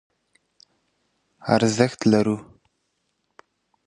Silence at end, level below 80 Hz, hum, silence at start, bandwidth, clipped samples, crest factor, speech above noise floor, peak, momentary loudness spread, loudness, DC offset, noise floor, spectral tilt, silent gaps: 1.45 s; -60 dBFS; none; 1.45 s; 11 kHz; under 0.1%; 24 dB; 54 dB; -2 dBFS; 11 LU; -21 LUFS; under 0.1%; -74 dBFS; -5.5 dB/octave; none